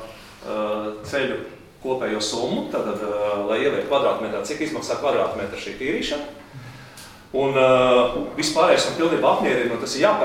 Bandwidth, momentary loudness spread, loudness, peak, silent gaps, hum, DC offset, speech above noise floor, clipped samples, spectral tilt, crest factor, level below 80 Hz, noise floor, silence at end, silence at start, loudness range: 16 kHz; 20 LU; -22 LUFS; -4 dBFS; none; none; under 0.1%; 21 dB; under 0.1%; -4 dB/octave; 18 dB; -52 dBFS; -43 dBFS; 0 s; 0 s; 7 LU